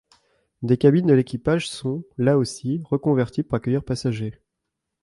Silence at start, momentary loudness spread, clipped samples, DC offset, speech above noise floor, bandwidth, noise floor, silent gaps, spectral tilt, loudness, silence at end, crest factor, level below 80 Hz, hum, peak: 0.6 s; 11 LU; under 0.1%; under 0.1%; 60 dB; 11.5 kHz; -81 dBFS; none; -7 dB/octave; -22 LUFS; 0.7 s; 18 dB; -52 dBFS; none; -4 dBFS